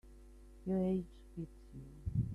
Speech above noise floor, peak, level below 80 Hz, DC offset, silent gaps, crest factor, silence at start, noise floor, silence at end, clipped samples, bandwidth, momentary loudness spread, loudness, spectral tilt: 18 dB; -24 dBFS; -54 dBFS; under 0.1%; none; 16 dB; 0.05 s; -57 dBFS; 0 s; under 0.1%; 10.5 kHz; 25 LU; -40 LUFS; -10.5 dB/octave